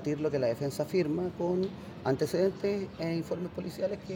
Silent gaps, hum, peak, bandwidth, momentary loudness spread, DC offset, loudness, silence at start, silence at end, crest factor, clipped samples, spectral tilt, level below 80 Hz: none; none; -16 dBFS; 17 kHz; 7 LU; under 0.1%; -32 LUFS; 0 s; 0 s; 16 dB; under 0.1%; -7 dB/octave; -64 dBFS